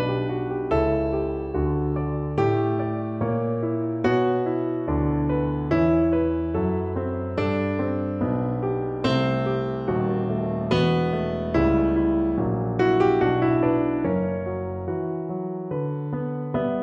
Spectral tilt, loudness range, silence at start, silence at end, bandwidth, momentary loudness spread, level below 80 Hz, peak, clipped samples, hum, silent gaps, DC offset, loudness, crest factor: -9 dB/octave; 3 LU; 0 s; 0 s; 7.4 kHz; 8 LU; -38 dBFS; -8 dBFS; under 0.1%; none; none; under 0.1%; -24 LUFS; 16 dB